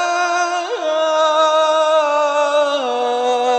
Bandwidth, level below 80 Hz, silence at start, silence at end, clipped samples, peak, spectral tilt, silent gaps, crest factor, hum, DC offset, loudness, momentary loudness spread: 8.8 kHz; -80 dBFS; 0 s; 0 s; under 0.1%; -4 dBFS; 0.5 dB/octave; none; 12 dB; none; under 0.1%; -16 LUFS; 5 LU